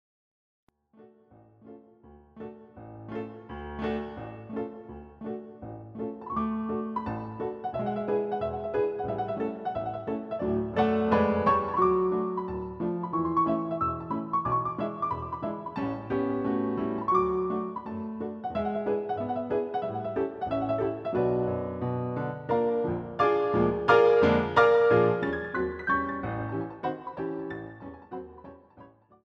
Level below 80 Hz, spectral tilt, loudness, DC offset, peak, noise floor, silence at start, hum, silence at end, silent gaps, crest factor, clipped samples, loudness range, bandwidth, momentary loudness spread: -54 dBFS; -8.5 dB/octave; -28 LUFS; under 0.1%; -8 dBFS; -57 dBFS; 1 s; none; 0.35 s; none; 22 dB; under 0.1%; 14 LU; 7 kHz; 16 LU